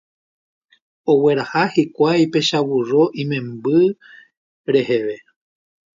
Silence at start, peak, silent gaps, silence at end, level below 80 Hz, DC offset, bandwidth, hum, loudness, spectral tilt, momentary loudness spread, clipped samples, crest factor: 1.05 s; -2 dBFS; 4.37-4.64 s; 0.8 s; -64 dBFS; under 0.1%; 7.6 kHz; none; -18 LUFS; -6 dB/octave; 12 LU; under 0.1%; 16 dB